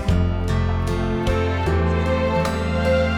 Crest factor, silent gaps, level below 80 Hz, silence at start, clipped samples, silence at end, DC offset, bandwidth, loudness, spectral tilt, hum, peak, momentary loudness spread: 12 dB; none; -26 dBFS; 0 s; under 0.1%; 0 s; under 0.1%; 12 kHz; -21 LUFS; -7 dB/octave; none; -6 dBFS; 3 LU